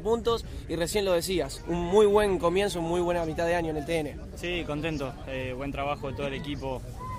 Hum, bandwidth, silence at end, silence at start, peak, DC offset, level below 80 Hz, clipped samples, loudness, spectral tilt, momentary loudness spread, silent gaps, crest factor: none; 16 kHz; 0 s; 0 s; -8 dBFS; under 0.1%; -42 dBFS; under 0.1%; -28 LUFS; -5 dB/octave; 12 LU; none; 20 dB